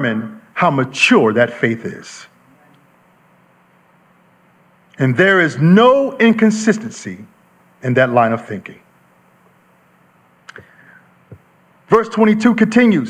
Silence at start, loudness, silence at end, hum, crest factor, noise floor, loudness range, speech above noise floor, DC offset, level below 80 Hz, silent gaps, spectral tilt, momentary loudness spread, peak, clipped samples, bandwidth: 0 s; -14 LUFS; 0 s; none; 16 dB; -53 dBFS; 11 LU; 39 dB; under 0.1%; -60 dBFS; none; -6 dB/octave; 19 LU; 0 dBFS; under 0.1%; 10 kHz